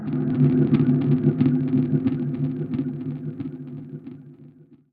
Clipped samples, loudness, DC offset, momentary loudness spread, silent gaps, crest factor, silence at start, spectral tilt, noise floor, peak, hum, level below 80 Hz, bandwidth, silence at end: under 0.1%; -22 LUFS; under 0.1%; 18 LU; none; 16 dB; 0 s; -12.5 dB/octave; -49 dBFS; -6 dBFS; none; -56 dBFS; 4.4 kHz; 0.15 s